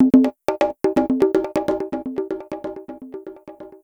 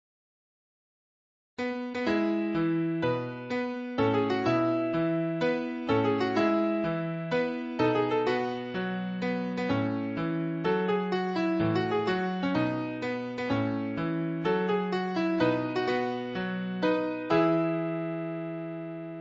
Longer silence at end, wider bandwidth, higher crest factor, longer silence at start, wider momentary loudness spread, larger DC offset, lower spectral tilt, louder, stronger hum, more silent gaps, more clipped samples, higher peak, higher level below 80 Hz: about the same, 0.05 s vs 0 s; first, 10.5 kHz vs 7.6 kHz; about the same, 18 dB vs 16 dB; second, 0 s vs 1.6 s; first, 19 LU vs 7 LU; neither; about the same, -7 dB/octave vs -7.5 dB/octave; first, -21 LUFS vs -29 LUFS; neither; neither; neither; first, -2 dBFS vs -12 dBFS; first, -52 dBFS vs -64 dBFS